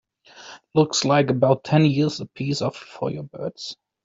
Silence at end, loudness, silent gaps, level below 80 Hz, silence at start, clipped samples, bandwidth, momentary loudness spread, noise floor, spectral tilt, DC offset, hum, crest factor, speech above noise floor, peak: 0.3 s; -22 LUFS; none; -60 dBFS; 0.35 s; under 0.1%; 7.8 kHz; 16 LU; -46 dBFS; -5.5 dB/octave; under 0.1%; none; 18 dB; 24 dB; -4 dBFS